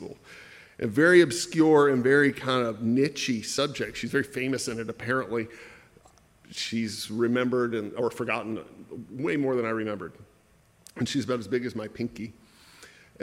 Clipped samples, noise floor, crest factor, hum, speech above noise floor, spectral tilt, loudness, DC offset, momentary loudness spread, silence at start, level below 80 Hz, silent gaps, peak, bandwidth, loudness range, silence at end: under 0.1%; -61 dBFS; 22 dB; none; 35 dB; -5 dB/octave; -26 LUFS; under 0.1%; 21 LU; 0 s; -64 dBFS; none; -6 dBFS; 15.5 kHz; 9 LU; 0.35 s